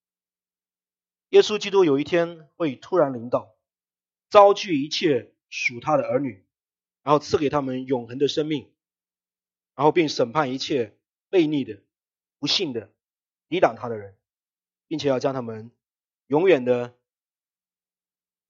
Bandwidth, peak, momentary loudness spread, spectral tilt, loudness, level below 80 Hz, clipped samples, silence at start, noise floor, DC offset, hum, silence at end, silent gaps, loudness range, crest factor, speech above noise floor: 7.6 kHz; 0 dBFS; 14 LU; -5 dB/octave; -22 LUFS; -68 dBFS; under 0.1%; 1.3 s; under -90 dBFS; under 0.1%; none; 1.6 s; none; 5 LU; 24 dB; over 68 dB